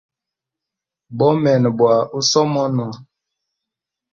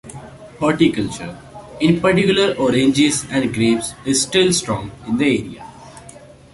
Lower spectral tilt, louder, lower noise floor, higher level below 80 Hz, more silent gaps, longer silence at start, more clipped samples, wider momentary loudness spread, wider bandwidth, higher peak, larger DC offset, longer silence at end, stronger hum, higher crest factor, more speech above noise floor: about the same, -5.5 dB/octave vs -4.5 dB/octave; about the same, -16 LUFS vs -17 LUFS; first, -85 dBFS vs -41 dBFS; second, -60 dBFS vs -46 dBFS; neither; first, 1.1 s vs 0.05 s; neither; second, 9 LU vs 20 LU; second, 7.6 kHz vs 11.5 kHz; about the same, -2 dBFS vs -2 dBFS; neither; first, 1.1 s vs 0.35 s; neither; about the same, 18 dB vs 16 dB; first, 69 dB vs 24 dB